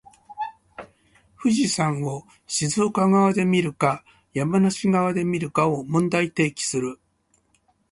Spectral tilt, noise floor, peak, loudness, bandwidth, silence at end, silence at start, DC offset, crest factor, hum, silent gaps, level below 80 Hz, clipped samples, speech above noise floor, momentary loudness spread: -5 dB/octave; -66 dBFS; -6 dBFS; -22 LUFS; 11.5 kHz; 1 s; 0.3 s; under 0.1%; 18 dB; none; none; -60 dBFS; under 0.1%; 45 dB; 15 LU